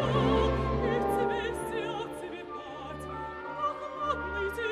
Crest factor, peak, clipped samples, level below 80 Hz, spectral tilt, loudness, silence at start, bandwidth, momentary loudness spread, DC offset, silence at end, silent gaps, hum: 16 dB; -14 dBFS; under 0.1%; -42 dBFS; -6.5 dB/octave; -32 LUFS; 0 s; 14.5 kHz; 13 LU; under 0.1%; 0 s; none; none